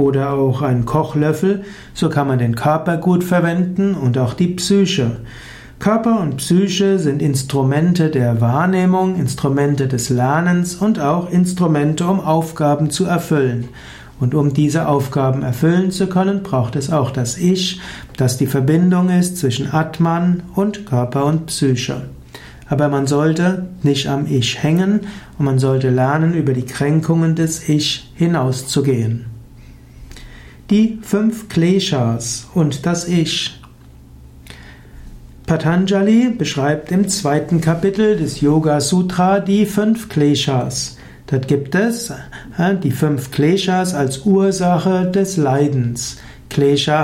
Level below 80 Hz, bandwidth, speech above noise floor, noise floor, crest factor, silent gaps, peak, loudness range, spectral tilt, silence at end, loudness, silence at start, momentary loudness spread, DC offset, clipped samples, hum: -44 dBFS; 16 kHz; 25 dB; -41 dBFS; 12 dB; none; -4 dBFS; 3 LU; -6 dB/octave; 0 s; -16 LUFS; 0 s; 7 LU; under 0.1%; under 0.1%; none